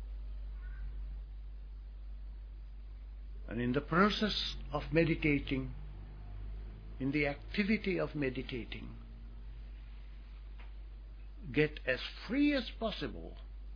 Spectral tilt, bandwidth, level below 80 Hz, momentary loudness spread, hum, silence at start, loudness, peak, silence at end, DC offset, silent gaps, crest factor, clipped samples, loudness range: -4.5 dB/octave; 5.4 kHz; -46 dBFS; 20 LU; none; 0 s; -35 LUFS; -14 dBFS; 0 s; under 0.1%; none; 24 dB; under 0.1%; 12 LU